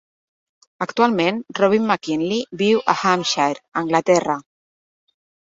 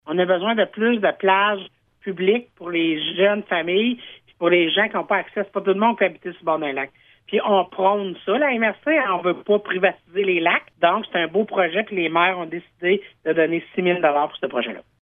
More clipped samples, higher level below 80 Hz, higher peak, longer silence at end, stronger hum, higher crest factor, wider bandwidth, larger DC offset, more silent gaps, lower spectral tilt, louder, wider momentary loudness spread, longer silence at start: neither; first, -64 dBFS vs -70 dBFS; about the same, -2 dBFS vs -2 dBFS; first, 1 s vs 0.2 s; neither; about the same, 18 dB vs 18 dB; first, 8 kHz vs 3.8 kHz; neither; first, 3.68-3.72 s vs none; second, -4.5 dB/octave vs -8.5 dB/octave; about the same, -19 LUFS vs -21 LUFS; about the same, 8 LU vs 7 LU; first, 0.8 s vs 0.05 s